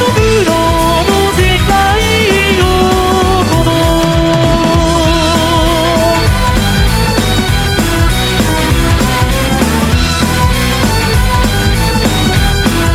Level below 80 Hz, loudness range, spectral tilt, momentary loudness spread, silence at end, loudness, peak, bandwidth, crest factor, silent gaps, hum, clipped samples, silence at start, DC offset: -18 dBFS; 1 LU; -4.5 dB/octave; 2 LU; 0 s; -10 LUFS; 0 dBFS; 17.5 kHz; 10 dB; none; none; 0.1%; 0 s; under 0.1%